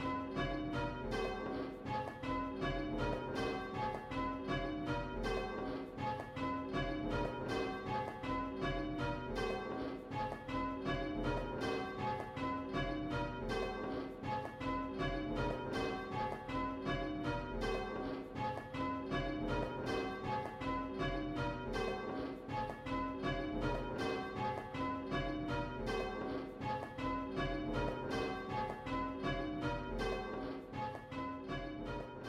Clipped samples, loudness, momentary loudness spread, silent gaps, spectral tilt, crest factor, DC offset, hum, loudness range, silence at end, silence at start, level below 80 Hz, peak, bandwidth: under 0.1%; -40 LUFS; 3 LU; none; -6.5 dB/octave; 14 dB; under 0.1%; none; 1 LU; 0 s; 0 s; -52 dBFS; -26 dBFS; 13.5 kHz